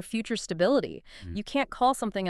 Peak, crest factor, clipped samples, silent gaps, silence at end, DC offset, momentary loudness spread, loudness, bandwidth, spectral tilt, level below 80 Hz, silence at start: -12 dBFS; 16 dB; under 0.1%; none; 0 s; under 0.1%; 14 LU; -28 LUFS; 13.5 kHz; -4.5 dB/octave; -52 dBFS; 0 s